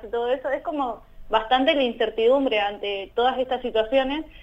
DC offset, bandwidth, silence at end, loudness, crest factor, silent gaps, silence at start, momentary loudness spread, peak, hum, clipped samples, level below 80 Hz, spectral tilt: under 0.1%; 8 kHz; 0 s; -23 LUFS; 16 dB; none; 0 s; 8 LU; -6 dBFS; none; under 0.1%; -48 dBFS; -5 dB/octave